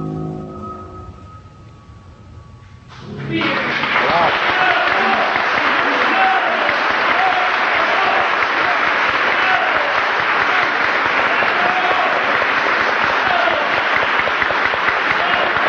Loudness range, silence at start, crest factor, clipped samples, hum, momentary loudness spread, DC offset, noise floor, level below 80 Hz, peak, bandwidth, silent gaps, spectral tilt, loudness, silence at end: 6 LU; 0 s; 14 dB; under 0.1%; none; 5 LU; under 0.1%; -40 dBFS; -48 dBFS; -2 dBFS; 12 kHz; none; -4 dB/octave; -15 LUFS; 0 s